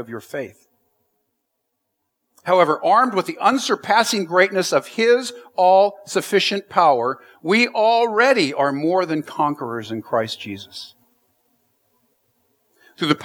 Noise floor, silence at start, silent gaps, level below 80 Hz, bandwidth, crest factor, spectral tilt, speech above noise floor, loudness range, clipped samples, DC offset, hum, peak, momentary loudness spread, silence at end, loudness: -75 dBFS; 0 s; none; -76 dBFS; 18 kHz; 20 dB; -4 dB/octave; 57 dB; 10 LU; under 0.1%; under 0.1%; none; 0 dBFS; 15 LU; 0 s; -18 LUFS